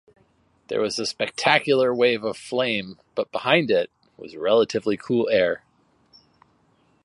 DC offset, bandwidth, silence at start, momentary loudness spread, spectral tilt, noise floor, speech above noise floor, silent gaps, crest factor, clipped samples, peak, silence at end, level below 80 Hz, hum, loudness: under 0.1%; 11.5 kHz; 0.7 s; 11 LU; -4.5 dB/octave; -63 dBFS; 41 dB; none; 24 dB; under 0.1%; 0 dBFS; 1.5 s; -64 dBFS; none; -22 LUFS